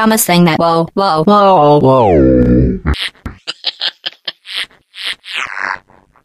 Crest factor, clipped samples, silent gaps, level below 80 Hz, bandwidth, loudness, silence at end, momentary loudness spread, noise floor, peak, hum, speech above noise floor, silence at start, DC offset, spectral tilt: 12 dB; under 0.1%; none; -26 dBFS; 15.5 kHz; -12 LUFS; 0.45 s; 15 LU; -34 dBFS; 0 dBFS; none; 25 dB; 0 s; under 0.1%; -5 dB/octave